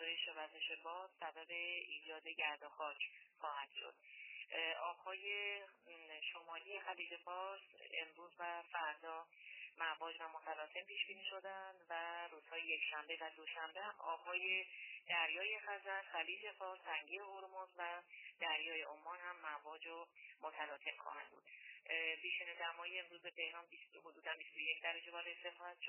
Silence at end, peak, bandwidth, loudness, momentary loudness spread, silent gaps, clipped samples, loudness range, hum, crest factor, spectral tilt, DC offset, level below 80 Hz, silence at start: 0 s; -26 dBFS; 3.1 kHz; -46 LUFS; 12 LU; none; under 0.1%; 5 LU; none; 22 dB; 7 dB/octave; under 0.1%; under -90 dBFS; 0 s